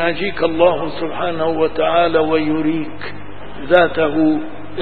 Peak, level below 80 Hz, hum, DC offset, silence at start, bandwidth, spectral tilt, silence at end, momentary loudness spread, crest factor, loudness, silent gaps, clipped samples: 0 dBFS; -44 dBFS; 50 Hz at -40 dBFS; 5%; 0 s; 4.7 kHz; -8.5 dB/octave; 0 s; 16 LU; 18 dB; -17 LUFS; none; under 0.1%